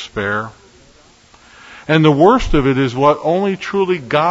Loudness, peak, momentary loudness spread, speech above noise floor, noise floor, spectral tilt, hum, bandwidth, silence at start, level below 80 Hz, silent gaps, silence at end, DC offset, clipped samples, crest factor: -14 LUFS; 0 dBFS; 10 LU; 34 dB; -47 dBFS; -7 dB/octave; none; 8 kHz; 0 s; -32 dBFS; none; 0 s; under 0.1%; under 0.1%; 16 dB